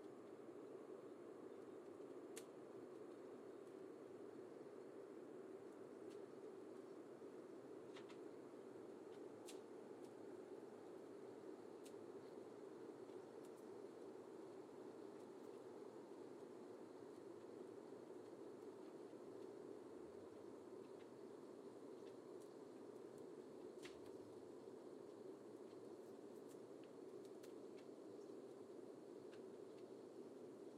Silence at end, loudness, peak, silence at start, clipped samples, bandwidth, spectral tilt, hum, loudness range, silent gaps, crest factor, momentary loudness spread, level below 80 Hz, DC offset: 0 s; -58 LUFS; -38 dBFS; 0 s; under 0.1%; 15 kHz; -5.5 dB/octave; none; 1 LU; none; 20 dB; 2 LU; under -90 dBFS; under 0.1%